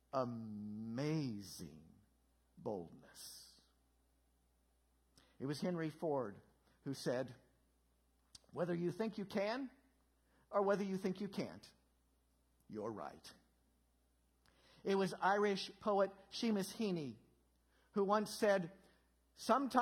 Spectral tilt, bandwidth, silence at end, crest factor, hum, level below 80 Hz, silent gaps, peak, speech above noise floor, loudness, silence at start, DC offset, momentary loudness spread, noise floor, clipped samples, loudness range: -5.5 dB/octave; 16.5 kHz; 0 s; 24 dB; none; -78 dBFS; none; -18 dBFS; 38 dB; -41 LUFS; 0.15 s; under 0.1%; 17 LU; -77 dBFS; under 0.1%; 13 LU